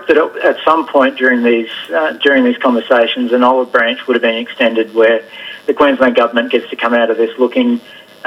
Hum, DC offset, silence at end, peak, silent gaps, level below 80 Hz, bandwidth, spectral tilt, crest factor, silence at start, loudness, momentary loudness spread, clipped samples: none; under 0.1%; 0.3 s; 0 dBFS; none; -56 dBFS; 12 kHz; -5 dB/octave; 12 dB; 0 s; -12 LUFS; 6 LU; under 0.1%